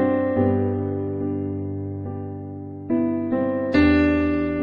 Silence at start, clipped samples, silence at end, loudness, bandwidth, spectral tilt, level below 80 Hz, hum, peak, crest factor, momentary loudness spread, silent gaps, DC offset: 0 s; under 0.1%; 0 s; -22 LUFS; 5.2 kHz; -9.5 dB/octave; -40 dBFS; none; -6 dBFS; 16 dB; 14 LU; none; under 0.1%